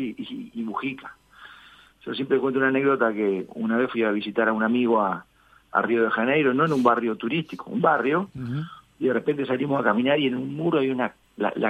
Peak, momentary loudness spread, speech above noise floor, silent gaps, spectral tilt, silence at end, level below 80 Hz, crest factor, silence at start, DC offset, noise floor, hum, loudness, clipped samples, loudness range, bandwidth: -4 dBFS; 11 LU; 28 dB; none; -7.5 dB/octave; 0 s; -66 dBFS; 20 dB; 0 s; under 0.1%; -51 dBFS; none; -24 LUFS; under 0.1%; 3 LU; 9.2 kHz